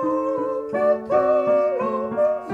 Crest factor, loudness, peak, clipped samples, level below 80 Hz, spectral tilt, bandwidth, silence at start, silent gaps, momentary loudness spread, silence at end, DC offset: 12 dB; -21 LUFS; -8 dBFS; under 0.1%; -60 dBFS; -8 dB/octave; 6.2 kHz; 0 s; none; 6 LU; 0 s; under 0.1%